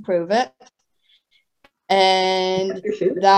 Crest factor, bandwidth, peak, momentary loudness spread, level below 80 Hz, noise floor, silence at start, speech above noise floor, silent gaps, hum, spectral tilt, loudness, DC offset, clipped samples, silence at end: 18 dB; 9 kHz; -2 dBFS; 7 LU; -68 dBFS; -63 dBFS; 0 s; 45 dB; none; none; -4 dB/octave; -19 LUFS; under 0.1%; under 0.1%; 0 s